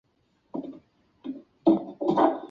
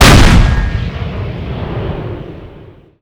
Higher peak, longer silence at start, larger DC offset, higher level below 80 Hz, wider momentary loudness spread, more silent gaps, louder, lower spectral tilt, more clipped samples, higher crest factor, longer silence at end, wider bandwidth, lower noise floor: second, -8 dBFS vs 0 dBFS; first, 0.55 s vs 0 s; neither; second, -70 dBFS vs -16 dBFS; about the same, 18 LU vs 19 LU; neither; second, -26 LUFS vs -13 LUFS; first, -8.5 dB/octave vs -5 dB/octave; second, under 0.1% vs 4%; first, 20 dB vs 12 dB; second, 0.05 s vs 0.35 s; second, 5.8 kHz vs over 20 kHz; first, -68 dBFS vs -37 dBFS